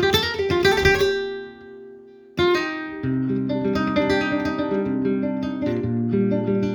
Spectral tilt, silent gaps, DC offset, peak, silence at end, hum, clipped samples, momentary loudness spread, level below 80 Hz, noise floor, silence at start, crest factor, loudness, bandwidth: -5.5 dB/octave; none; under 0.1%; -4 dBFS; 0 s; none; under 0.1%; 12 LU; -44 dBFS; -44 dBFS; 0 s; 18 dB; -22 LUFS; over 20 kHz